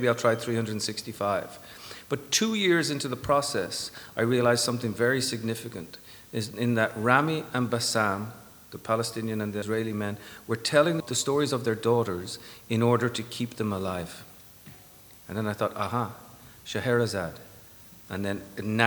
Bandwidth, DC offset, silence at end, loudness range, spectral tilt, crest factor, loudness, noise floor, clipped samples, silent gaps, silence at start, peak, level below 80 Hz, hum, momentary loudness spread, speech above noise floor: 19 kHz; under 0.1%; 0 s; 5 LU; -4.5 dB/octave; 24 dB; -28 LUFS; -51 dBFS; under 0.1%; none; 0 s; -4 dBFS; -62 dBFS; none; 20 LU; 24 dB